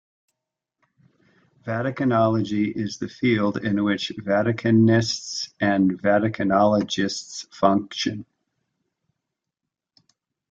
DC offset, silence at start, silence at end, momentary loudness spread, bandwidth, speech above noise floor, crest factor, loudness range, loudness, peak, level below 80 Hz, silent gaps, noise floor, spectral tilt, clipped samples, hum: under 0.1%; 1.65 s; 2.3 s; 10 LU; 7.8 kHz; 63 dB; 20 dB; 6 LU; -22 LUFS; -4 dBFS; -60 dBFS; none; -85 dBFS; -5.5 dB/octave; under 0.1%; none